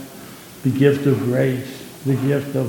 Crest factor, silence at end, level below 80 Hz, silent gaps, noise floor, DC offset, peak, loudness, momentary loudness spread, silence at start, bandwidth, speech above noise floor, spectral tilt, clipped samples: 18 dB; 0 s; -58 dBFS; none; -38 dBFS; under 0.1%; -2 dBFS; -20 LUFS; 20 LU; 0 s; 17.5 kHz; 20 dB; -7.5 dB/octave; under 0.1%